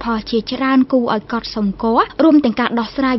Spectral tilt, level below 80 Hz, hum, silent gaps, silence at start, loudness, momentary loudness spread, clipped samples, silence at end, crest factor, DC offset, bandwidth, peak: -7 dB/octave; -44 dBFS; none; none; 0 s; -16 LUFS; 8 LU; under 0.1%; 0 s; 14 dB; under 0.1%; 6 kHz; -2 dBFS